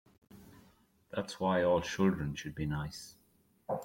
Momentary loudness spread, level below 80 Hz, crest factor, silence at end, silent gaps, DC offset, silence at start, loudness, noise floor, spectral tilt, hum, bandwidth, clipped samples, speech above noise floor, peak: 16 LU; -58 dBFS; 18 dB; 0 s; none; under 0.1%; 0.35 s; -34 LUFS; -70 dBFS; -6 dB/octave; none; 16.5 kHz; under 0.1%; 37 dB; -18 dBFS